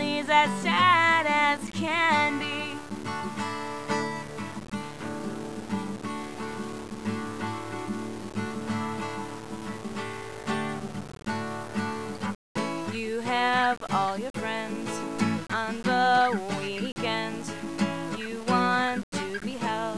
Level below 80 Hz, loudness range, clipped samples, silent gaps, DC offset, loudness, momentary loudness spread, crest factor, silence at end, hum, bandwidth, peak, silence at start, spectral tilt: -62 dBFS; 9 LU; under 0.1%; 12.35-12.55 s, 14.30-14.34 s, 16.92-16.96 s, 19.03-19.12 s; 0.4%; -28 LUFS; 14 LU; 20 dB; 0 s; none; 11 kHz; -8 dBFS; 0 s; -4.5 dB/octave